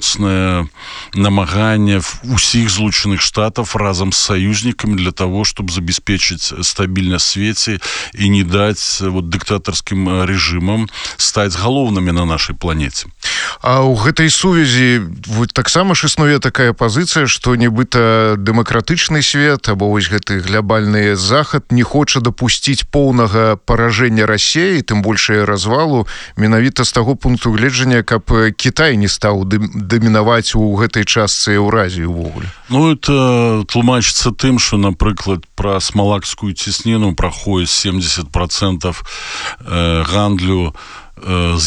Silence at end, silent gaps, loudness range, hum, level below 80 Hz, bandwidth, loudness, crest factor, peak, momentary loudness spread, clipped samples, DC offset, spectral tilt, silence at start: 0 s; none; 3 LU; none; -30 dBFS; 11 kHz; -13 LUFS; 12 dB; 0 dBFS; 7 LU; under 0.1%; under 0.1%; -4.5 dB/octave; 0 s